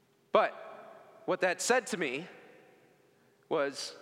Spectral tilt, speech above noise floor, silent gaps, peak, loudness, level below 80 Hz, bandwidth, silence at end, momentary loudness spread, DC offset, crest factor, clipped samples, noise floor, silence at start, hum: -2.5 dB/octave; 34 dB; none; -12 dBFS; -32 LUFS; under -90 dBFS; 16 kHz; 0 s; 20 LU; under 0.1%; 22 dB; under 0.1%; -66 dBFS; 0.35 s; none